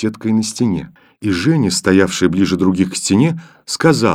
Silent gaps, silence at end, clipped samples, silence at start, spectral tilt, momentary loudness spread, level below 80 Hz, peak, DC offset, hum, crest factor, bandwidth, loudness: none; 0 s; under 0.1%; 0 s; -5 dB/octave; 9 LU; -48 dBFS; 0 dBFS; under 0.1%; none; 14 dB; 15.5 kHz; -15 LUFS